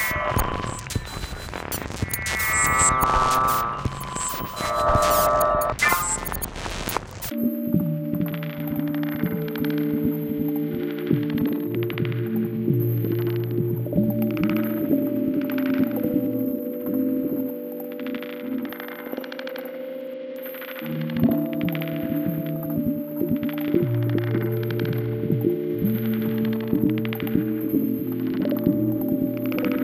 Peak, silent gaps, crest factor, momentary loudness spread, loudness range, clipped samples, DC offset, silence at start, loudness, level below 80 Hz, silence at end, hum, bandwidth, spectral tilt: -6 dBFS; none; 18 dB; 11 LU; 6 LU; under 0.1%; under 0.1%; 0 s; -24 LUFS; -42 dBFS; 0 s; none; 16.5 kHz; -5.5 dB/octave